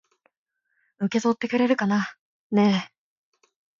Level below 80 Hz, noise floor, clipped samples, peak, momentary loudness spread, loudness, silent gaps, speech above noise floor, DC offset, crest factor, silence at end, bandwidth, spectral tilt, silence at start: -70 dBFS; -72 dBFS; under 0.1%; -8 dBFS; 10 LU; -24 LUFS; 2.19-2.50 s; 50 dB; under 0.1%; 18 dB; 0.9 s; 7.4 kHz; -6 dB/octave; 1 s